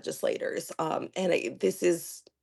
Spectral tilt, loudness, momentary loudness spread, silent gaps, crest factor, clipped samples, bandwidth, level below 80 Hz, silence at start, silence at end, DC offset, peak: -4.5 dB/octave; -30 LUFS; 6 LU; none; 16 dB; under 0.1%; 12.5 kHz; -76 dBFS; 0.05 s; 0.2 s; under 0.1%; -14 dBFS